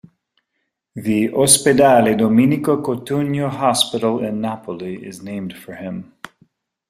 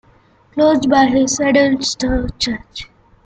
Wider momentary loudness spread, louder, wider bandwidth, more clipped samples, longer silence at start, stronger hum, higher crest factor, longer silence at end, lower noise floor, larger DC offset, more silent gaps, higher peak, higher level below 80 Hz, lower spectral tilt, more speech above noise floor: first, 19 LU vs 15 LU; about the same, -16 LUFS vs -15 LUFS; first, 16 kHz vs 9.2 kHz; neither; first, 0.95 s vs 0.55 s; neither; about the same, 18 dB vs 14 dB; first, 0.85 s vs 0.4 s; first, -74 dBFS vs -51 dBFS; neither; neither; about the same, 0 dBFS vs -2 dBFS; second, -56 dBFS vs -36 dBFS; about the same, -4 dB/octave vs -3.5 dB/octave; first, 57 dB vs 36 dB